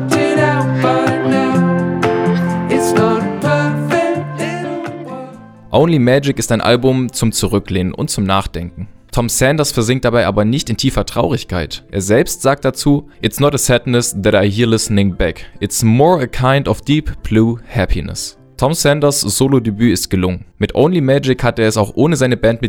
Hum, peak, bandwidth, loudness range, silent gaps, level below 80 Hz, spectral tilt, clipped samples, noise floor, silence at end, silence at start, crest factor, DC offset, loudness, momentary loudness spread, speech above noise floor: none; 0 dBFS; 19 kHz; 2 LU; none; -32 dBFS; -5 dB/octave; under 0.1%; -34 dBFS; 0 s; 0 s; 14 dB; under 0.1%; -14 LUFS; 9 LU; 20 dB